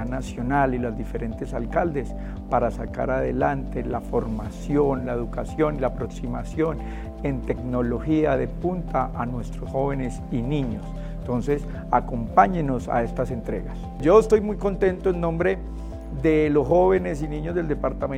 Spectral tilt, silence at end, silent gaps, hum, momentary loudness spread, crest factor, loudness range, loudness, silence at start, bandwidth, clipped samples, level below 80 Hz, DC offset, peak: -8 dB/octave; 0 s; none; none; 11 LU; 22 dB; 5 LU; -24 LUFS; 0 s; 11 kHz; under 0.1%; -34 dBFS; under 0.1%; -2 dBFS